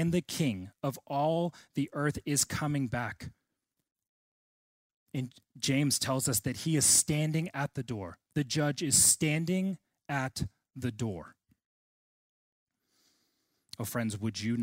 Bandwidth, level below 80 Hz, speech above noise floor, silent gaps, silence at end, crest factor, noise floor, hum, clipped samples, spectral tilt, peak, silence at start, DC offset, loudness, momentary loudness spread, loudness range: 16 kHz; -62 dBFS; 54 dB; 4.09-5.07 s, 11.66-12.66 s; 0 s; 22 dB; -85 dBFS; none; under 0.1%; -3.5 dB/octave; -12 dBFS; 0 s; under 0.1%; -30 LUFS; 16 LU; 14 LU